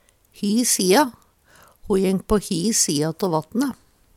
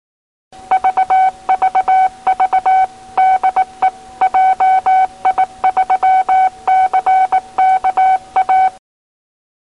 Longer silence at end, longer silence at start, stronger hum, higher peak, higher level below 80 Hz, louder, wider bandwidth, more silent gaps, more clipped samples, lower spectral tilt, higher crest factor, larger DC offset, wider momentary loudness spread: second, 0.45 s vs 1.05 s; second, 0.4 s vs 0.7 s; neither; about the same, -4 dBFS vs -4 dBFS; first, -44 dBFS vs -52 dBFS; second, -20 LUFS vs -13 LUFS; first, 17.5 kHz vs 10.5 kHz; neither; neither; about the same, -4 dB/octave vs -3 dB/octave; first, 18 dB vs 10 dB; second, under 0.1% vs 0.2%; first, 8 LU vs 4 LU